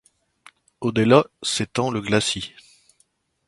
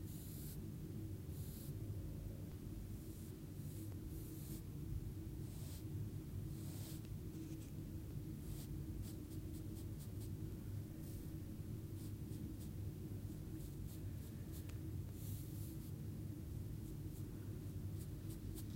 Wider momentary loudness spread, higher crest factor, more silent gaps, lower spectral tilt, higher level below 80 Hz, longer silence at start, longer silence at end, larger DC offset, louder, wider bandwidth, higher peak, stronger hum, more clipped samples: first, 12 LU vs 2 LU; first, 24 dB vs 14 dB; neither; second, -4.5 dB/octave vs -7 dB/octave; about the same, -56 dBFS vs -56 dBFS; first, 0.8 s vs 0 s; first, 1 s vs 0 s; neither; first, -21 LUFS vs -50 LUFS; second, 11.5 kHz vs 16 kHz; first, 0 dBFS vs -34 dBFS; neither; neither